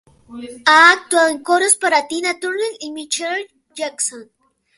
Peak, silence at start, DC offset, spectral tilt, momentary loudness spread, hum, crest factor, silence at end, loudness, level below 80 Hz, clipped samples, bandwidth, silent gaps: 0 dBFS; 0.3 s; under 0.1%; 0.5 dB/octave; 18 LU; none; 18 dB; 0.55 s; -15 LUFS; -66 dBFS; under 0.1%; 12 kHz; none